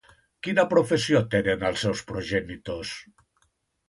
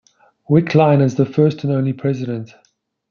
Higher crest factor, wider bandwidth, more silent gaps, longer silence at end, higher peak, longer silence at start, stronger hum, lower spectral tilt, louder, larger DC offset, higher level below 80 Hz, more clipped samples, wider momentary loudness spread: about the same, 20 dB vs 16 dB; first, 11.5 kHz vs 6.8 kHz; neither; first, 0.85 s vs 0.65 s; second, -8 dBFS vs 0 dBFS; about the same, 0.45 s vs 0.5 s; neither; second, -5 dB/octave vs -8.5 dB/octave; second, -25 LUFS vs -16 LUFS; neither; first, -52 dBFS vs -60 dBFS; neither; first, 14 LU vs 10 LU